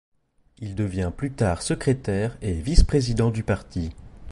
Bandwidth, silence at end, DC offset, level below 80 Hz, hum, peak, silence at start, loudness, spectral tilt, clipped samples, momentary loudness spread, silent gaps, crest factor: 11.5 kHz; 0 s; under 0.1%; -28 dBFS; none; -2 dBFS; 0.6 s; -25 LUFS; -6 dB/octave; under 0.1%; 12 LU; none; 22 dB